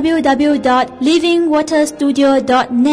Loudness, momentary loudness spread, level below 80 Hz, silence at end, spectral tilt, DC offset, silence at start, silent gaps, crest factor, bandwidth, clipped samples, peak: -13 LUFS; 2 LU; -48 dBFS; 0 s; -4 dB/octave; under 0.1%; 0 s; none; 8 dB; 11 kHz; under 0.1%; -4 dBFS